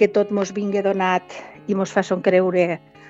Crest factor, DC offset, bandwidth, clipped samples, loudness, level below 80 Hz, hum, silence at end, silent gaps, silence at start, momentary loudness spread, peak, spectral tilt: 18 dB; under 0.1%; 8 kHz; under 0.1%; -20 LUFS; -66 dBFS; none; 0 s; none; 0 s; 7 LU; -2 dBFS; -6 dB/octave